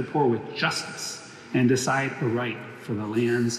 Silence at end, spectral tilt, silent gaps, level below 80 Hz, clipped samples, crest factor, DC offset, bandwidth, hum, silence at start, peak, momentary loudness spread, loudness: 0 s; -5 dB/octave; none; -70 dBFS; under 0.1%; 16 dB; under 0.1%; 14.5 kHz; none; 0 s; -10 dBFS; 11 LU; -26 LUFS